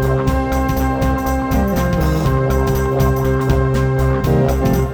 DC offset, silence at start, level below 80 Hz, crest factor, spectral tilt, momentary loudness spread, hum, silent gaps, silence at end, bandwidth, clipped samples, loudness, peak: under 0.1%; 0 s; -22 dBFS; 14 dB; -7.5 dB/octave; 2 LU; none; none; 0 s; over 20 kHz; under 0.1%; -16 LUFS; -2 dBFS